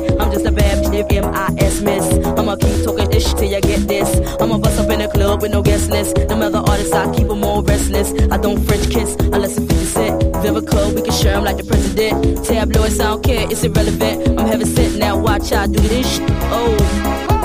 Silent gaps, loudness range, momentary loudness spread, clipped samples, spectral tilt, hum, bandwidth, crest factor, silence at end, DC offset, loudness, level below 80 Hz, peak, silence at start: none; 1 LU; 2 LU; under 0.1%; -5.5 dB/octave; none; 15.5 kHz; 12 dB; 0 s; under 0.1%; -16 LUFS; -20 dBFS; -2 dBFS; 0 s